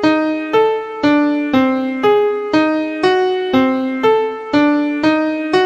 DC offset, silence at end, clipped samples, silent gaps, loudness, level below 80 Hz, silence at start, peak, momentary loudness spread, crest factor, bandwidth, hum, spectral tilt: under 0.1%; 0 s; under 0.1%; none; -15 LUFS; -54 dBFS; 0 s; -2 dBFS; 3 LU; 14 dB; 7.8 kHz; none; -6 dB/octave